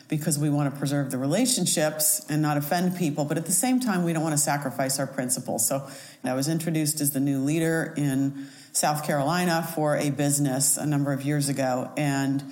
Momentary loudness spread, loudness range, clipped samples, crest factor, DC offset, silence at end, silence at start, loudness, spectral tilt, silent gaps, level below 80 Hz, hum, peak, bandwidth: 5 LU; 2 LU; under 0.1%; 16 dB; under 0.1%; 0 s; 0.1 s; -25 LUFS; -4.5 dB/octave; none; -70 dBFS; none; -8 dBFS; 17 kHz